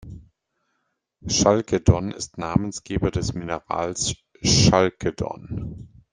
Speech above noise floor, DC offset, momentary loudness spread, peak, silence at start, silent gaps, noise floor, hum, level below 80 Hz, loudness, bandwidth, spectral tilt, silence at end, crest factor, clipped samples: 53 dB; under 0.1%; 15 LU; -2 dBFS; 0 s; none; -75 dBFS; none; -40 dBFS; -22 LUFS; 10.5 kHz; -4.5 dB/octave; 0.25 s; 22 dB; under 0.1%